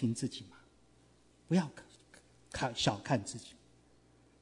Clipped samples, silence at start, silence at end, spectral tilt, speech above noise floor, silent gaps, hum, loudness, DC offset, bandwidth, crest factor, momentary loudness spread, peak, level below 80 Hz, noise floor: under 0.1%; 0 s; 0.9 s; -5 dB/octave; 31 dB; none; none; -36 LUFS; under 0.1%; 11 kHz; 22 dB; 23 LU; -16 dBFS; -64 dBFS; -65 dBFS